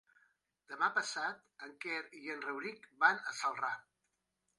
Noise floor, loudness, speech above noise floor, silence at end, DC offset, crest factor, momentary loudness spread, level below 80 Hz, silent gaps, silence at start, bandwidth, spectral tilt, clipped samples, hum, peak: -85 dBFS; -37 LUFS; 47 dB; 0.8 s; under 0.1%; 24 dB; 15 LU; under -90 dBFS; none; 0.7 s; 11.5 kHz; -1.5 dB/octave; under 0.1%; none; -14 dBFS